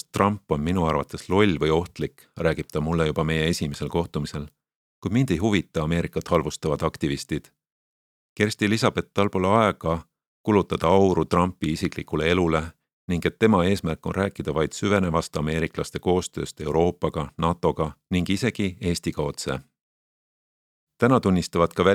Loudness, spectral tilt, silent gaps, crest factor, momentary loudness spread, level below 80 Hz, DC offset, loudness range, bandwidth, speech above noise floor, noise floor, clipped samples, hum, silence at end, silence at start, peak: -24 LUFS; -6 dB/octave; 4.75-5.02 s, 7.72-8.36 s, 10.27-10.44 s, 12.93-13.08 s, 19.81-20.87 s; 22 dB; 9 LU; -44 dBFS; under 0.1%; 4 LU; 16 kHz; over 67 dB; under -90 dBFS; under 0.1%; none; 0 s; 0.15 s; -2 dBFS